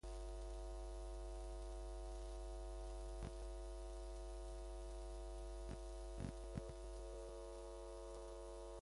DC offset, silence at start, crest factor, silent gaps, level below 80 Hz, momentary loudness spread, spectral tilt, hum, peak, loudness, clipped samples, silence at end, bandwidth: under 0.1%; 0.05 s; 18 dB; none; -52 dBFS; 2 LU; -6 dB/octave; none; -32 dBFS; -53 LUFS; under 0.1%; 0 s; 11.5 kHz